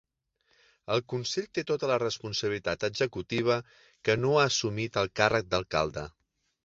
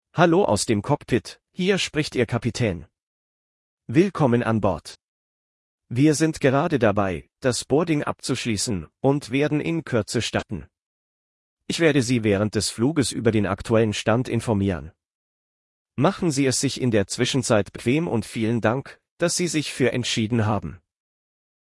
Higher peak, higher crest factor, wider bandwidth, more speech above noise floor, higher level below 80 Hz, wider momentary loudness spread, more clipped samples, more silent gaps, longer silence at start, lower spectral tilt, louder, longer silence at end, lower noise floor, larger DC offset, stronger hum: about the same, -6 dBFS vs -4 dBFS; first, 24 dB vs 18 dB; second, 7.8 kHz vs 12 kHz; second, 44 dB vs over 68 dB; about the same, -56 dBFS vs -52 dBFS; about the same, 7 LU vs 7 LU; neither; second, none vs 3.02-3.77 s, 5.03-5.78 s, 10.82-11.57 s, 15.15-15.85 s, 19.11-19.17 s; first, 0.9 s vs 0.15 s; about the same, -4 dB/octave vs -5 dB/octave; second, -29 LUFS vs -22 LUFS; second, 0.55 s vs 0.95 s; second, -73 dBFS vs under -90 dBFS; neither; neither